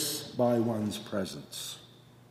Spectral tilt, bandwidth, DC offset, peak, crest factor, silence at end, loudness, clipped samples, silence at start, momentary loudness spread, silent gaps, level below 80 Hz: -4.5 dB/octave; 16 kHz; under 0.1%; -14 dBFS; 18 dB; 0.35 s; -32 LUFS; under 0.1%; 0 s; 12 LU; none; -70 dBFS